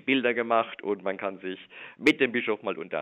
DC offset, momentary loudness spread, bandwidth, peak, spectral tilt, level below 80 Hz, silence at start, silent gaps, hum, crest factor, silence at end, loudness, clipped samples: under 0.1%; 14 LU; 8.8 kHz; -8 dBFS; -5 dB/octave; -74 dBFS; 0.05 s; none; none; 20 dB; 0 s; -27 LUFS; under 0.1%